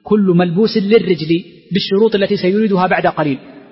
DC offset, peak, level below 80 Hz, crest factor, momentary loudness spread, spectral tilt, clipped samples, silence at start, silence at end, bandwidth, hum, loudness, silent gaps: under 0.1%; -2 dBFS; -54 dBFS; 12 dB; 7 LU; -10 dB/octave; under 0.1%; 0.05 s; 0.1 s; 5.8 kHz; none; -14 LUFS; none